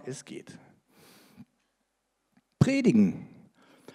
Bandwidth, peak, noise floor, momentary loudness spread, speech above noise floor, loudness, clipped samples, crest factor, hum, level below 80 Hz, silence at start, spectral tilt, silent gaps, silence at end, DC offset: 11.5 kHz; -8 dBFS; -78 dBFS; 22 LU; 52 dB; -25 LUFS; under 0.1%; 22 dB; none; -64 dBFS; 0.05 s; -7 dB/octave; none; 0.7 s; under 0.1%